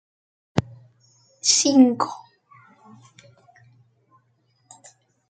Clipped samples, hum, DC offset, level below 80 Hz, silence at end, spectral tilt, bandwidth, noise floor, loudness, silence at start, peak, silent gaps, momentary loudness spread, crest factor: under 0.1%; none; under 0.1%; -62 dBFS; 3.1 s; -3.5 dB/octave; 9.4 kHz; -66 dBFS; -19 LUFS; 0.55 s; -2 dBFS; none; 13 LU; 22 dB